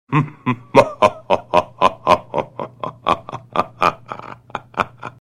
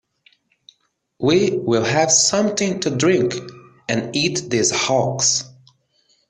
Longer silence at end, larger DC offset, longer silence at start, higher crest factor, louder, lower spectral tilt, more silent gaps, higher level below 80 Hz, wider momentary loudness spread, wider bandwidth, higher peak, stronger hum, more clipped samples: second, 0.15 s vs 0.8 s; neither; second, 0.1 s vs 1.2 s; about the same, 20 dB vs 18 dB; about the same, -19 LUFS vs -18 LUFS; first, -6 dB/octave vs -3 dB/octave; neither; first, -50 dBFS vs -58 dBFS; first, 15 LU vs 10 LU; first, 14.5 kHz vs 10.5 kHz; about the same, 0 dBFS vs -2 dBFS; neither; neither